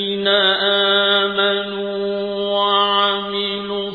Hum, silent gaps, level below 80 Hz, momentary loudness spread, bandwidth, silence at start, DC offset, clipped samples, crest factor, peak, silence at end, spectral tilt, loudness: none; none; -60 dBFS; 8 LU; 5 kHz; 0 s; under 0.1%; under 0.1%; 14 dB; -4 dBFS; 0 s; -5.5 dB/octave; -17 LUFS